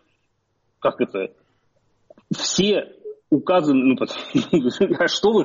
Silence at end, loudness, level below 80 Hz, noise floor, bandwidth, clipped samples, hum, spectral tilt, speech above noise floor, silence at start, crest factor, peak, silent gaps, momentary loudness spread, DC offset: 0 s; -20 LUFS; -58 dBFS; -69 dBFS; 7.6 kHz; under 0.1%; none; -4 dB/octave; 50 dB; 0.8 s; 14 dB; -8 dBFS; none; 12 LU; under 0.1%